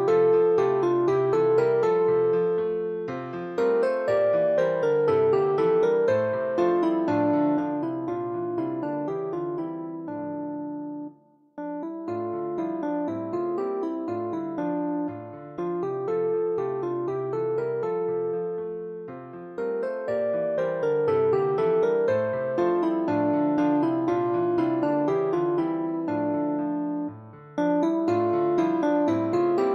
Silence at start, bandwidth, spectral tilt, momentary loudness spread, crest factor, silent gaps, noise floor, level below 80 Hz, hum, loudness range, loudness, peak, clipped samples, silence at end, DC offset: 0 s; 7.4 kHz; -8.5 dB/octave; 11 LU; 12 dB; none; -53 dBFS; -68 dBFS; none; 8 LU; -25 LUFS; -12 dBFS; under 0.1%; 0 s; under 0.1%